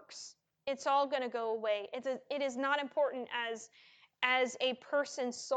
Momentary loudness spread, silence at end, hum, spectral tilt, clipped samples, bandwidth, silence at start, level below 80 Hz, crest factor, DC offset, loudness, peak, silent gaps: 14 LU; 0 s; none; -1.5 dB/octave; under 0.1%; 9.2 kHz; 0 s; -88 dBFS; 20 dB; under 0.1%; -35 LUFS; -14 dBFS; none